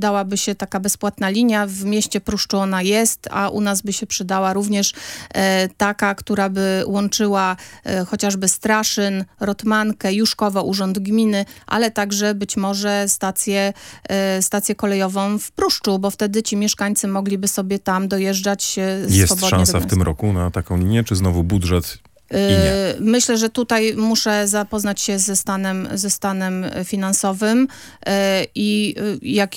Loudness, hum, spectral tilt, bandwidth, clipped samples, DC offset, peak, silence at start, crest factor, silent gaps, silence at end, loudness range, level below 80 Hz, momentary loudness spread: -19 LUFS; none; -4 dB/octave; 17 kHz; under 0.1%; under 0.1%; 0 dBFS; 0 s; 18 dB; none; 0 s; 2 LU; -40 dBFS; 6 LU